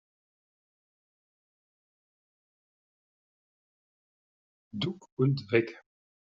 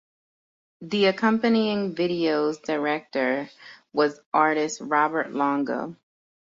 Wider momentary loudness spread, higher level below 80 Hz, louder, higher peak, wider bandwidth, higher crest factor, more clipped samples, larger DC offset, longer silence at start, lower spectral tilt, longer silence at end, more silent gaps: first, 12 LU vs 9 LU; about the same, -74 dBFS vs -70 dBFS; second, -30 LUFS vs -24 LUFS; second, -12 dBFS vs -6 dBFS; about the same, 7.4 kHz vs 7.8 kHz; first, 26 dB vs 18 dB; neither; neither; first, 4.75 s vs 0.8 s; about the same, -6 dB/octave vs -5 dB/octave; second, 0.45 s vs 0.65 s; about the same, 5.12-5.17 s vs 4.26-4.32 s